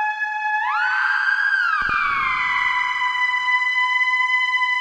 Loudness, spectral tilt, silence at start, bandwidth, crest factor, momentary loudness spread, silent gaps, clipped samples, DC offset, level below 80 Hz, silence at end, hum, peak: -18 LUFS; 0 dB/octave; 0 s; 11.5 kHz; 12 dB; 3 LU; none; under 0.1%; under 0.1%; -52 dBFS; 0 s; none; -8 dBFS